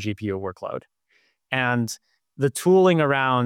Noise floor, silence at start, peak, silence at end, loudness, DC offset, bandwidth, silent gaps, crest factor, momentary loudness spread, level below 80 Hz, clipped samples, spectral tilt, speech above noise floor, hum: -66 dBFS; 0 s; -8 dBFS; 0 s; -22 LUFS; under 0.1%; 16 kHz; none; 14 dB; 17 LU; -68 dBFS; under 0.1%; -5.5 dB/octave; 44 dB; none